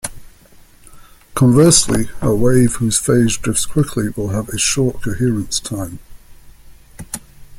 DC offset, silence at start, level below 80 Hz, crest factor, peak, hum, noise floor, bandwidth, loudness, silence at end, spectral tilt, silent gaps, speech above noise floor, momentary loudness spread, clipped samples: under 0.1%; 0.05 s; -36 dBFS; 16 dB; 0 dBFS; none; -45 dBFS; 16.5 kHz; -15 LUFS; 0 s; -4.5 dB/octave; none; 30 dB; 18 LU; under 0.1%